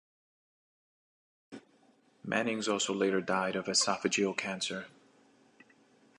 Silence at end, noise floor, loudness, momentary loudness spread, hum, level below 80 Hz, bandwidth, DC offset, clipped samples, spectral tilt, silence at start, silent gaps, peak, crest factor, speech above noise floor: 1.3 s; -66 dBFS; -31 LUFS; 24 LU; none; -78 dBFS; 11 kHz; under 0.1%; under 0.1%; -3 dB/octave; 1.5 s; none; -14 dBFS; 22 dB; 35 dB